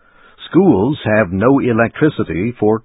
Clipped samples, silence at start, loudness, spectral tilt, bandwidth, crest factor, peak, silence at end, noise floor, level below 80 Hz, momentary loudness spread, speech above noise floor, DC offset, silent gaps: under 0.1%; 0.4 s; -14 LUFS; -13 dB/octave; 4 kHz; 14 dB; 0 dBFS; 0.05 s; -39 dBFS; -40 dBFS; 5 LU; 26 dB; under 0.1%; none